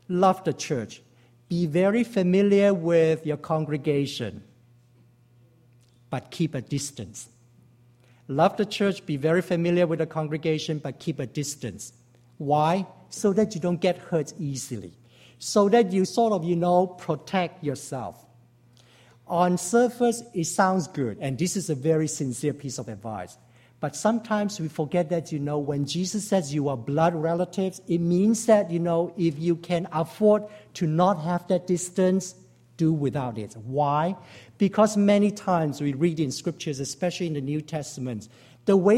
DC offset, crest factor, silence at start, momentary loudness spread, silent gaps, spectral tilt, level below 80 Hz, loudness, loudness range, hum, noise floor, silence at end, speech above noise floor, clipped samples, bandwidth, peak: under 0.1%; 18 dB; 0.1 s; 13 LU; none; -6 dB/octave; -64 dBFS; -25 LUFS; 5 LU; none; -58 dBFS; 0 s; 34 dB; under 0.1%; 15.5 kHz; -6 dBFS